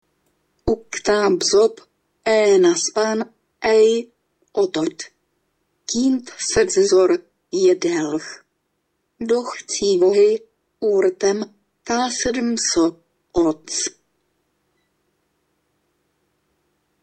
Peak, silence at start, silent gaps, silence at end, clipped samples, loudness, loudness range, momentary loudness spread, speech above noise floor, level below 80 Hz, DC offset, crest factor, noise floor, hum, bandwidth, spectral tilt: -4 dBFS; 0.65 s; none; 3.1 s; under 0.1%; -19 LUFS; 5 LU; 13 LU; 54 dB; -50 dBFS; under 0.1%; 16 dB; -72 dBFS; none; 8.8 kHz; -3 dB/octave